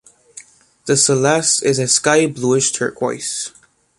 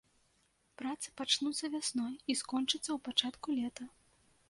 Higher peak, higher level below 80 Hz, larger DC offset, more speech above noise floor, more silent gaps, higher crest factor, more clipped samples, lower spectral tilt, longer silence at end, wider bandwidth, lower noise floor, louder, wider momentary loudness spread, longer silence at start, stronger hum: first, 0 dBFS vs -12 dBFS; first, -60 dBFS vs -76 dBFS; neither; second, 26 dB vs 38 dB; neither; second, 18 dB vs 26 dB; neither; first, -3 dB/octave vs -1 dB/octave; about the same, 0.5 s vs 0.6 s; about the same, 11.5 kHz vs 11.5 kHz; second, -43 dBFS vs -74 dBFS; first, -15 LUFS vs -35 LUFS; about the same, 10 LU vs 10 LU; second, 0.35 s vs 0.8 s; neither